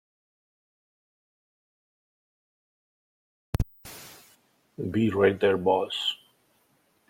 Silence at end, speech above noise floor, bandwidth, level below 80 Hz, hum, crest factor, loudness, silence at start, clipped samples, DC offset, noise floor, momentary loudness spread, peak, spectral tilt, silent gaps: 0.95 s; 43 dB; 16.5 kHz; -48 dBFS; none; 22 dB; -26 LUFS; 3.6 s; under 0.1%; under 0.1%; -68 dBFS; 21 LU; -10 dBFS; -6 dB/octave; none